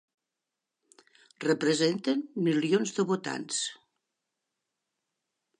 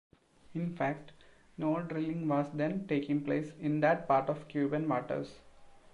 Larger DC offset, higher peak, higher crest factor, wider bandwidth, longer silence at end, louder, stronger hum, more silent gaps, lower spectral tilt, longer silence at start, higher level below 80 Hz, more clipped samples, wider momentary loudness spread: neither; first, -12 dBFS vs -16 dBFS; about the same, 20 dB vs 18 dB; about the same, 11 kHz vs 10.5 kHz; first, 1.85 s vs 0.15 s; first, -29 LUFS vs -33 LUFS; neither; neither; second, -4.5 dB/octave vs -8.5 dB/octave; first, 1.4 s vs 0.5 s; second, -84 dBFS vs -68 dBFS; neither; second, 6 LU vs 10 LU